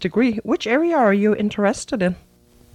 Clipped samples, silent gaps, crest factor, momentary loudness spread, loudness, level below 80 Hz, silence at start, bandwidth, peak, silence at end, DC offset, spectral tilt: under 0.1%; none; 14 dB; 6 LU; -19 LUFS; -52 dBFS; 0 s; 11 kHz; -4 dBFS; 0.6 s; under 0.1%; -6 dB/octave